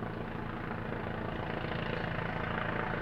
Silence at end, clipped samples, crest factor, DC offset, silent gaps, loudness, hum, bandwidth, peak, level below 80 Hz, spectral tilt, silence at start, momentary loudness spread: 0 s; under 0.1%; 18 dB; under 0.1%; none; -37 LUFS; none; 12.5 kHz; -18 dBFS; -48 dBFS; -8 dB/octave; 0 s; 5 LU